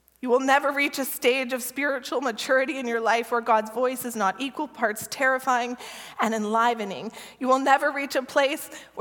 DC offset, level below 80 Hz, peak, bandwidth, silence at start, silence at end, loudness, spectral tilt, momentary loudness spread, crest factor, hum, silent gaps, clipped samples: under 0.1%; -72 dBFS; -6 dBFS; 17.5 kHz; 0.25 s; 0 s; -24 LUFS; -2.5 dB/octave; 10 LU; 20 dB; none; none; under 0.1%